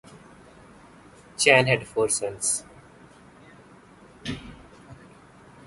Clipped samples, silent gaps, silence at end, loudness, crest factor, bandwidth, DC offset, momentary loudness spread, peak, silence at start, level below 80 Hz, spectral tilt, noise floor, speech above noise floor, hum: under 0.1%; none; 0.7 s; -22 LUFS; 28 dB; 12 kHz; under 0.1%; 21 LU; -2 dBFS; 1.4 s; -56 dBFS; -2.5 dB/octave; -51 dBFS; 29 dB; none